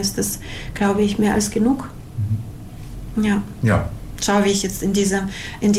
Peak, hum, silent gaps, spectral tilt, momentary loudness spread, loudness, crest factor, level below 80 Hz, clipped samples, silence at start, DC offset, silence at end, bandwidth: -8 dBFS; none; none; -5 dB/octave; 13 LU; -21 LUFS; 12 dB; -38 dBFS; under 0.1%; 0 s; under 0.1%; 0 s; 16 kHz